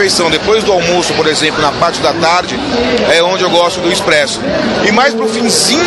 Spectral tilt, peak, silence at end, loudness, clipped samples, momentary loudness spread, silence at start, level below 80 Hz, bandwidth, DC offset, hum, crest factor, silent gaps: -3 dB/octave; 0 dBFS; 0 s; -10 LUFS; under 0.1%; 4 LU; 0 s; -38 dBFS; 15 kHz; under 0.1%; none; 10 dB; none